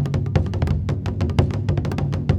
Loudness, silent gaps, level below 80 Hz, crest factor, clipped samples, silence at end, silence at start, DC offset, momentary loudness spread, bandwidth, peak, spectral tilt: -22 LUFS; none; -30 dBFS; 16 dB; under 0.1%; 0 s; 0 s; under 0.1%; 3 LU; 8.8 kHz; -4 dBFS; -8 dB/octave